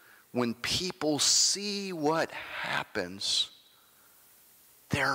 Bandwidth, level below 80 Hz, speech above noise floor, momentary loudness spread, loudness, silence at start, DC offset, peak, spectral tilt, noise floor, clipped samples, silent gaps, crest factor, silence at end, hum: 16 kHz; -62 dBFS; 30 dB; 12 LU; -29 LUFS; 0.35 s; under 0.1%; -16 dBFS; -2 dB/octave; -61 dBFS; under 0.1%; none; 16 dB; 0 s; none